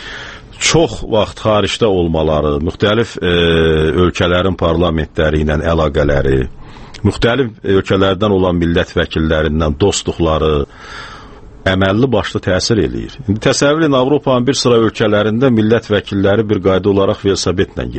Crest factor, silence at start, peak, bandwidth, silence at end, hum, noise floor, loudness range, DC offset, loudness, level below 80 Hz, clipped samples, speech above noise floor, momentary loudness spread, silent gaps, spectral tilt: 14 dB; 0 s; 0 dBFS; 8.8 kHz; 0 s; none; -34 dBFS; 3 LU; under 0.1%; -14 LUFS; -28 dBFS; under 0.1%; 21 dB; 6 LU; none; -5.5 dB/octave